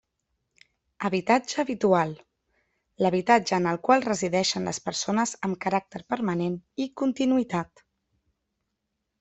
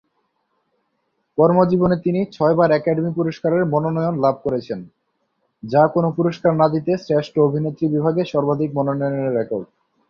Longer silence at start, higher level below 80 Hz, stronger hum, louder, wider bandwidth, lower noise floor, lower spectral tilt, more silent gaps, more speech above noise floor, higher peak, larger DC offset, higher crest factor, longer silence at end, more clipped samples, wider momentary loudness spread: second, 1 s vs 1.35 s; second, -66 dBFS vs -56 dBFS; neither; second, -26 LUFS vs -19 LUFS; first, 8.4 kHz vs 6.8 kHz; first, -81 dBFS vs -71 dBFS; second, -4.5 dB/octave vs -9 dB/octave; neither; about the same, 55 dB vs 52 dB; second, -6 dBFS vs -2 dBFS; neither; first, 22 dB vs 16 dB; first, 1.55 s vs 0.45 s; neither; about the same, 10 LU vs 8 LU